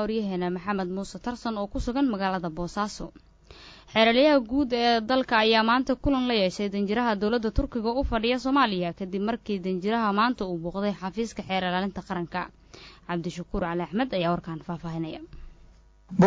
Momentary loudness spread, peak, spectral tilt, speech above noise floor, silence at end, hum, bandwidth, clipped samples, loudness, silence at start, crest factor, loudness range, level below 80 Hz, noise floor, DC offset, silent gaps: 12 LU; -8 dBFS; -6 dB/octave; 28 dB; 0 s; none; 8 kHz; under 0.1%; -26 LUFS; 0 s; 18 dB; 8 LU; -44 dBFS; -54 dBFS; under 0.1%; none